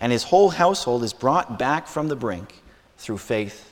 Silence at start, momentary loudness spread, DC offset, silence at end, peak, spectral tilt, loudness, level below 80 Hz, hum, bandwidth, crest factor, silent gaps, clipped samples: 0 s; 15 LU; under 0.1%; 0.1 s; -4 dBFS; -5 dB/octave; -22 LUFS; -54 dBFS; none; 17.5 kHz; 18 dB; none; under 0.1%